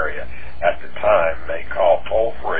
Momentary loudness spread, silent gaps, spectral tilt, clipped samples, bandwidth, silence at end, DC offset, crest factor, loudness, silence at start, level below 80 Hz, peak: 11 LU; none; -8.5 dB/octave; under 0.1%; 4.7 kHz; 0 s; 9%; 16 dB; -20 LUFS; 0 s; -40 dBFS; -4 dBFS